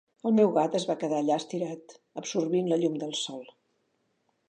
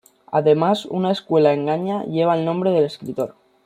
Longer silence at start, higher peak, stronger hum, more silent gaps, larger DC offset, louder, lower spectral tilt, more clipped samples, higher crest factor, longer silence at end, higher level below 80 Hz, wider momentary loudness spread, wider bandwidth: about the same, 0.25 s vs 0.3 s; second, -10 dBFS vs -2 dBFS; neither; neither; neither; second, -28 LUFS vs -20 LUFS; second, -5.5 dB/octave vs -7.5 dB/octave; neither; about the same, 18 dB vs 16 dB; first, 1.05 s vs 0.35 s; second, -82 dBFS vs -66 dBFS; first, 15 LU vs 10 LU; second, 9.8 kHz vs 14 kHz